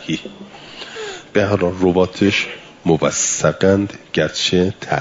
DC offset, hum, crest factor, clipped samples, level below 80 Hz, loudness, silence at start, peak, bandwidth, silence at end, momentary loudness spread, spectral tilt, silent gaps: under 0.1%; none; 16 dB; under 0.1%; -52 dBFS; -17 LUFS; 0 s; -2 dBFS; 7.8 kHz; 0 s; 15 LU; -4 dB/octave; none